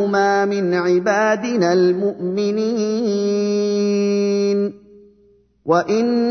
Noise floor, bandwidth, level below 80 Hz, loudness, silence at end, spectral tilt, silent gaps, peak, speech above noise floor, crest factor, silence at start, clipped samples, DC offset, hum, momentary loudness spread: -55 dBFS; 6.6 kHz; -64 dBFS; -18 LUFS; 0 s; -6 dB/octave; none; -4 dBFS; 38 dB; 14 dB; 0 s; under 0.1%; under 0.1%; none; 5 LU